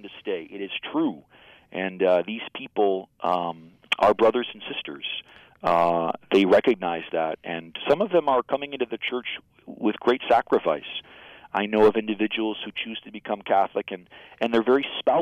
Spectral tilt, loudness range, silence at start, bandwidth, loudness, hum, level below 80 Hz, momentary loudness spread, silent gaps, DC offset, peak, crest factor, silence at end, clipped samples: -6 dB/octave; 3 LU; 0.05 s; 9.6 kHz; -24 LUFS; none; -62 dBFS; 13 LU; none; under 0.1%; -10 dBFS; 14 dB; 0 s; under 0.1%